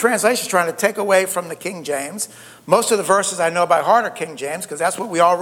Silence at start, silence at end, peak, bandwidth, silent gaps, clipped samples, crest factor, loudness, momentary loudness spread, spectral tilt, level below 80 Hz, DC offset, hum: 0 s; 0 s; 0 dBFS; 17.5 kHz; none; under 0.1%; 18 dB; -18 LUFS; 11 LU; -3 dB/octave; -68 dBFS; under 0.1%; none